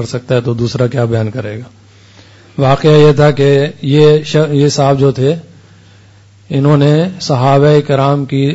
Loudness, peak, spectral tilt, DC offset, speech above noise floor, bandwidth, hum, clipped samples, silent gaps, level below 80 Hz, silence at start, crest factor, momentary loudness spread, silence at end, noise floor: -11 LUFS; 0 dBFS; -7 dB/octave; under 0.1%; 32 dB; 8 kHz; none; under 0.1%; none; -44 dBFS; 0 s; 10 dB; 9 LU; 0 s; -42 dBFS